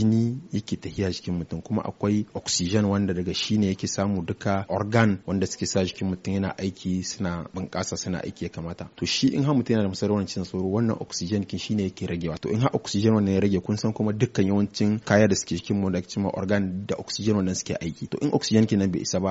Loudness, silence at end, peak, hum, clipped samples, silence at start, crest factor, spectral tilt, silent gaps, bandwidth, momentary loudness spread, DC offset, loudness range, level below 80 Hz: -25 LUFS; 0 s; -4 dBFS; none; under 0.1%; 0 s; 20 dB; -6 dB/octave; none; 8 kHz; 9 LU; under 0.1%; 4 LU; -54 dBFS